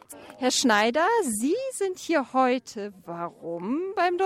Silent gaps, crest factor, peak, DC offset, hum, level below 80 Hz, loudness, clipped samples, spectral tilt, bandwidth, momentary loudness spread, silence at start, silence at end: none; 16 dB; -10 dBFS; under 0.1%; none; -70 dBFS; -25 LUFS; under 0.1%; -2.5 dB/octave; 16 kHz; 15 LU; 0.1 s; 0 s